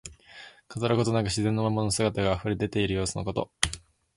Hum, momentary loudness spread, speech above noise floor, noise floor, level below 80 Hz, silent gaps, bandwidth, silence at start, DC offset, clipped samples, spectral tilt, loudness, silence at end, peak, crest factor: none; 18 LU; 23 dB; -50 dBFS; -46 dBFS; none; 11.5 kHz; 0.05 s; under 0.1%; under 0.1%; -5 dB/octave; -27 LUFS; 0.35 s; 0 dBFS; 28 dB